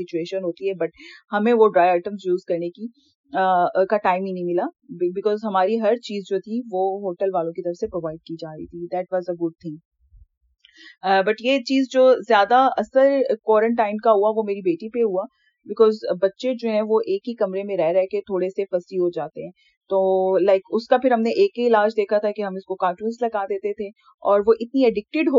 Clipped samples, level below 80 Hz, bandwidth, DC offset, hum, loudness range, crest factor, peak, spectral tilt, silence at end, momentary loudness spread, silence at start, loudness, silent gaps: under 0.1%; -64 dBFS; 7.4 kHz; under 0.1%; none; 8 LU; 18 dB; -4 dBFS; -4 dB/octave; 0 s; 12 LU; 0 s; -21 LUFS; 3.15-3.24 s, 9.85-9.91 s, 19.77-19.81 s, 24.14-24.18 s